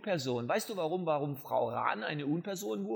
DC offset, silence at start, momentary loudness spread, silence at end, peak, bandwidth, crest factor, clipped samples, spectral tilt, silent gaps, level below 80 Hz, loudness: under 0.1%; 0 s; 3 LU; 0 s; -16 dBFS; over 20 kHz; 18 dB; under 0.1%; -5.5 dB/octave; none; -82 dBFS; -34 LUFS